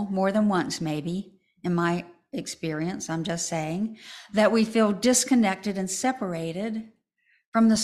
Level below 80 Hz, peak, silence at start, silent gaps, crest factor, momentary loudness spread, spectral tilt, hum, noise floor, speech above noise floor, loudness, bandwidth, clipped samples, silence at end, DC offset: -62 dBFS; -8 dBFS; 0 s; 7.46-7.52 s; 18 dB; 13 LU; -4.5 dB/octave; none; -68 dBFS; 43 dB; -26 LUFS; 13.5 kHz; under 0.1%; 0 s; under 0.1%